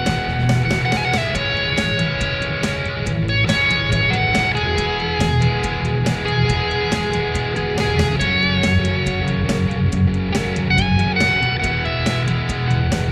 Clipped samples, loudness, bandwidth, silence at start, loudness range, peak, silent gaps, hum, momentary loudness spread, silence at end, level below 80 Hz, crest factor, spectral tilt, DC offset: under 0.1%; -18 LUFS; 12.5 kHz; 0 s; 1 LU; -2 dBFS; none; none; 5 LU; 0 s; -30 dBFS; 16 dB; -5.5 dB/octave; under 0.1%